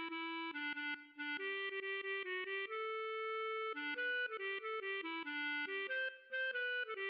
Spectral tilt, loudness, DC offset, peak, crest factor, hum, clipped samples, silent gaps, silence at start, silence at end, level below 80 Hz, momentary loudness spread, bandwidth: 3.5 dB/octave; -41 LUFS; under 0.1%; -32 dBFS; 10 dB; none; under 0.1%; none; 0 s; 0 s; under -90 dBFS; 4 LU; 5.6 kHz